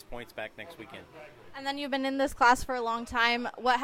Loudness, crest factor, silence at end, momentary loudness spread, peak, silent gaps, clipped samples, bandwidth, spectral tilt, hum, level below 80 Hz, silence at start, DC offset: -28 LUFS; 22 dB; 0 s; 22 LU; -8 dBFS; none; under 0.1%; 16 kHz; -3 dB/octave; none; -52 dBFS; 0.1 s; under 0.1%